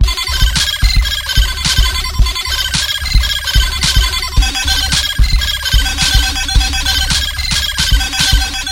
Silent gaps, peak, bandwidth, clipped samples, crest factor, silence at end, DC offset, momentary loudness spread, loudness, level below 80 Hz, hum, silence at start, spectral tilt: none; 0 dBFS; 17 kHz; 0.1%; 12 dB; 0 s; under 0.1%; 3 LU; -13 LUFS; -16 dBFS; none; 0 s; -1.5 dB/octave